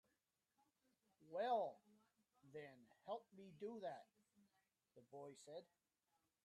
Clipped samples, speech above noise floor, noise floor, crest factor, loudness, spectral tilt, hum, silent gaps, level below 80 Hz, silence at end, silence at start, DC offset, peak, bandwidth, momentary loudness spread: under 0.1%; 40 dB; -90 dBFS; 22 dB; -51 LUFS; -5 dB/octave; none; none; under -90 dBFS; 0.8 s; 1.2 s; under 0.1%; -32 dBFS; 11.5 kHz; 19 LU